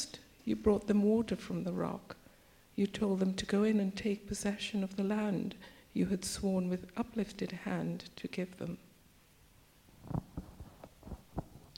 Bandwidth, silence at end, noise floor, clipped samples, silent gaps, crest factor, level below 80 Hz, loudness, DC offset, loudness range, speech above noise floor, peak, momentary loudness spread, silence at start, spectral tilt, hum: 16.5 kHz; 0.15 s; -64 dBFS; under 0.1%; none; 20 dB; -58 dBFS; -36 LUFS; under 0.1%; 10 LU; 29 dB; -16 dBFS; 19 LU; 0 s; -6 dB/octave; none